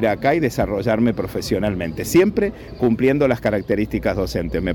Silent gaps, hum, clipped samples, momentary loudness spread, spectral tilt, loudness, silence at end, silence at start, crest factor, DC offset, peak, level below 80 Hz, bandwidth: none; none; under 0.1%; 6 LU; -6.5 dB/octave; -20 LUFS; 0 s; 0 s; 12 dB; under 0.1%; -6 dBFS; -36 dBFS; 19 kHz